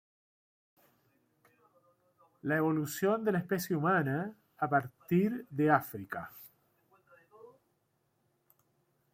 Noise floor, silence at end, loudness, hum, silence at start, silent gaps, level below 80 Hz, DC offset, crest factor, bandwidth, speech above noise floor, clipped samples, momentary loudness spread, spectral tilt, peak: -77 dBFS; 1.7 s; -32 LUFS; none; 2.45 s; none; -76 dBFS; under 0.1%; 22 dB; 16.5 kHz; 46 dB; under 0.1%; 14 LU; -6.5 dB/octave; -14 dBFS